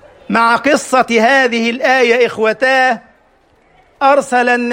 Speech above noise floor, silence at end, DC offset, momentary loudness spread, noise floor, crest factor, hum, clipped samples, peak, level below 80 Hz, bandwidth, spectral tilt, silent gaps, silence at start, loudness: 40 dB; 0 s; under 0.1%; 4 LU; -52 dBFS; 12 dB; none; under 0.1%; 0 dBFS; -58 dBFS; 16.5 kHz; -3.5 dB/octave; none; 0.3 s; -12 LUFS